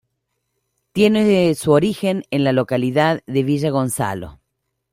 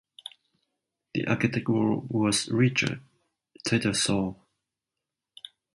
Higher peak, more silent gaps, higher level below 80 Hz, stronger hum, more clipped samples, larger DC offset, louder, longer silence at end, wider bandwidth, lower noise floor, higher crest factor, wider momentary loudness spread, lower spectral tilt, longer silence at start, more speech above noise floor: first, -2 dBFS vs -10 dBFS; neither; first, -52 dBFS vs -60 dBFS; neither; neither; neither; first, -18 LUFS vs -26 LUFS; second, 0.6 s vs 1.4 s; first, 16 kHz vs 11.5 kHz; second, -75 dBFS vs -87 dBFS; about the same, 16 dB vs 20 dB; second, 9 LU vs 20 LU; first, -6 dB/octave vs -4.5 dB/octave; second, 0.95 s vs 1.15 s; second, 58 dB vs 62 dB